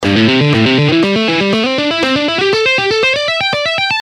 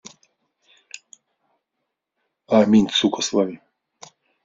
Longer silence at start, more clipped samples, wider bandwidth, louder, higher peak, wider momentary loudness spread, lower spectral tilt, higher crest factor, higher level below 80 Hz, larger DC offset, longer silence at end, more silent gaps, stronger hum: second, 0 s vs 2.5 s; neither; first, 12 kHz vs 7.6 kHz; first, -11 LUFS vs -19 LUFS; first, 0 dBFS vs -4 dBFS; second, 3 LU vs 25 LU; about the same, -5 dB/octave vs -4.5 dB/octave; second, 12 dB vs 20 dB; first, -48 dBFS vs -60 dBFS; neither; second, 0 s vs 0.9 s; neither; neither